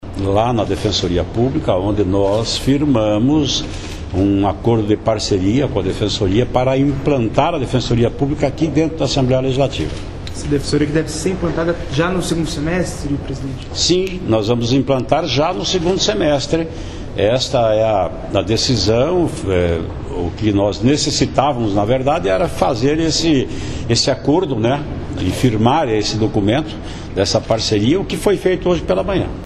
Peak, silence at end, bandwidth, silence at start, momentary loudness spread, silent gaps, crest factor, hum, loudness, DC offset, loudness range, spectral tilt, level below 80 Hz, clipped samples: 0 dBFS; 0 s; 13 kHz; 0 s; 7 LU; none; 16 dB; none; -17 LUFS; under 0.1%; 2 LU; -5.5 dB/octave; -32 dBFS; under 0.1%